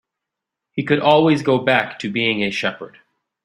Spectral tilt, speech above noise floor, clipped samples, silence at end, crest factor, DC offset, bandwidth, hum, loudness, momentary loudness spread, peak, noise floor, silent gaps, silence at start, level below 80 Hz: -6 dB/octave; 65 dB; under 0.1%; 0.55 s; 18 dB; under 0.1%; 11.5 kHz; none; -18 LUFS; 15 LU; -2 dBFS; -83 dBFS; none; 0.75 s; -60 dBFS